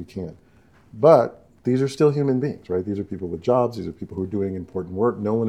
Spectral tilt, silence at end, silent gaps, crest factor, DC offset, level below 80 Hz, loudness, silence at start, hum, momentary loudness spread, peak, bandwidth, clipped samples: -8.5 dB/octave; 0 s; none; 22 dB; under 0.1%; -60 dBFS; -22 LUFS; 0 s; none; 15 LU; 0 dBFS; 12 kHz; under 0.1%